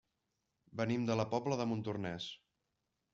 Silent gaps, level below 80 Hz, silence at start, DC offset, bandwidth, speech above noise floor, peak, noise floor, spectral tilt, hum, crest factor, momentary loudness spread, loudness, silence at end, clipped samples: none; -72 dBFS; 0.75 s; under 0.1%; 7.6 kHz; 49 dB; -20 dBFS; -86 dBFS; -5.5 dB/octave; none; 20 dB; 12 LU; -38 LUFS; 0.75 s; under 0.1%